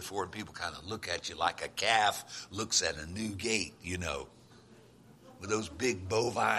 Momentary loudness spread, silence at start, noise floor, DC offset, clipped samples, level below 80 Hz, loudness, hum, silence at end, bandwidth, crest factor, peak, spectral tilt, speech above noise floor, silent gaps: 12 LU; 0 s; -58 dBFS; under 0.1%; under 0.1%; -62 dBFS; -33 LUFS; none; 0 s; 15 kHz; 24 dB; -10 dBFS; -2.5 dB/octave; 24 dB; none